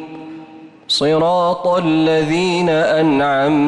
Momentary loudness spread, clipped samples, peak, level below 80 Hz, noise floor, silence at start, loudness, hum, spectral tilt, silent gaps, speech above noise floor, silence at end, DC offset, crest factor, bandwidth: 18 LU; under 0.1%; -6 dBFS; -52 dBFS; -38 dBFS; 0 s; -15 LUFS; none; -5.5 dB/octave; none; 24 dB; 0 s; under 0.1%; 8 dB; 11.5 kHz